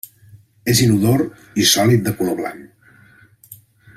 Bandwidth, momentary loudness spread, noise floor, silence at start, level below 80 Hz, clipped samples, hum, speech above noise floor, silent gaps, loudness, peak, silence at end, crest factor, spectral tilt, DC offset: 16 kHz; 14 LU; -49 dBFS; 0.35 s; -50 dBFS; under 0.1%; none; 33 dB; none; -16 LUFS; -2 dBFS; 0.4 s; 18 dB; -4.5 dB/octave; under 0.1%